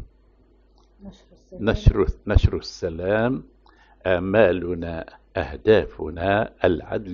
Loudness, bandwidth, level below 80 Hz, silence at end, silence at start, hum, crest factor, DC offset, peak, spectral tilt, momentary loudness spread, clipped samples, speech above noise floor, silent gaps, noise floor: -23 LUFS; 7.2 kHz; -30 dBFS; 0 s; 0 s; none; 22 dB; under 0.1%; 0 dBFS; -6 dB/octave; 12 LU; under 0.1%; 35 dB; none; -56 dBFS